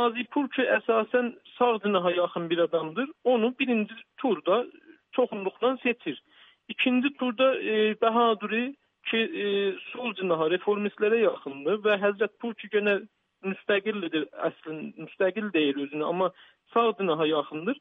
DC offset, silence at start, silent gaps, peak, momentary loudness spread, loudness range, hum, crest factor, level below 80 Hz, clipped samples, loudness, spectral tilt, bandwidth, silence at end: under 0.1%; 0 s; none; -12 dBFS; 9 LU; 3 LU; none; 16 dB; -84 dBFS; under 0.1%; -27 LUFS; -8 dB/octave; 3.9 kHz; 0 s